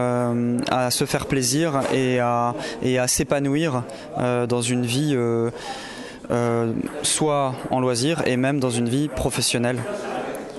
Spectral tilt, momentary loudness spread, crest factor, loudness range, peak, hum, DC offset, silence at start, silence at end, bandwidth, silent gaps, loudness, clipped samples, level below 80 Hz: -4.5 dB/octave; 8 LU; 16 dB; 2 LU; -6 dBFS; none; under 0.1%; 0 s; 0 s; 12.5 kHz; none; -22 LUFS; under 0.1%; -48 dBFS